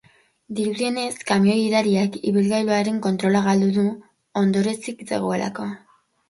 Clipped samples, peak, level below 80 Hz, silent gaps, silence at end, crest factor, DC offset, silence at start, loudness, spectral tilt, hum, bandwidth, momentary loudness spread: under 0.1%; -4 dBFS; -64 dBFS; none; 0.55 s; 16 dB; under 0.1%; 0.5 s; -21 LUFS; -6 dB/octave; none; 11.5 kHz; 12 LU